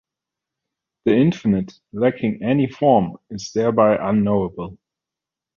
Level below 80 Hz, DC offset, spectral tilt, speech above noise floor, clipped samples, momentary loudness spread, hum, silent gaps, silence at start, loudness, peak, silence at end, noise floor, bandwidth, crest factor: -52 dBFS; under 0.1%; -7.5 dB/octave; 68 dB; under 0.1%; 12 LU; none; none; 1.05 s; -19 LUFS; -2 dBFS; 0.85 s; -87 dBFS; 7.2 kHz; 18 dB